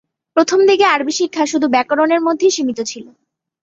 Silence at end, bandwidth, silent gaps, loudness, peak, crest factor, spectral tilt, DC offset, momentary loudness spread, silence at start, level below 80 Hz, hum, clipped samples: 0.6 s; 8 kHz; none; -15 LUFS; -2 dBFS; 14 dB; -2.5 dB/octave; under 0.1%; 9 LU; 0.35 s; -64 dBFS; none; under 0.1%